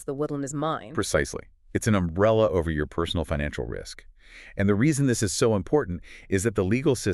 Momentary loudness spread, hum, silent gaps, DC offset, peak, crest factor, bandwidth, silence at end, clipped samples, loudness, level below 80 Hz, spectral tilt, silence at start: 12 LU; none; none; under 0.1%; -8 dBFS; 18 dB; 13.5 kHz; 0 s; under 0.1%; -25 LUFS; -42 dBFS; -5.5 dB/octave; 0 s